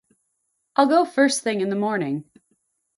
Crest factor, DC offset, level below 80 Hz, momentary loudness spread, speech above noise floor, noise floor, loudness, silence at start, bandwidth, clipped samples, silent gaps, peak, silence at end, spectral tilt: 20 dB; under 0.1%; -74 dBFS; 9 LU; 54 dB; -74 dBFS; -21 LUFS; 0.8 s; 11.5 kHz; under 0.1%; none; -4 dBFS; 0.75 s; -4.5 dB/octave